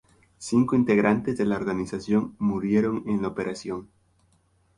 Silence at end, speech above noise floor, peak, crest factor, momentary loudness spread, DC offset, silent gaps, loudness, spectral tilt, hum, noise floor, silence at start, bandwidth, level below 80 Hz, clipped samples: 0.95 s; 41 dB; -8 dBFS; 18 dB; 11 LU; under 0.1%; none; -25 LUFS; -7 dB/octave; none; -65 dBFS; 0.4 s; 11 kHz; -56 dBFS; under 0.1%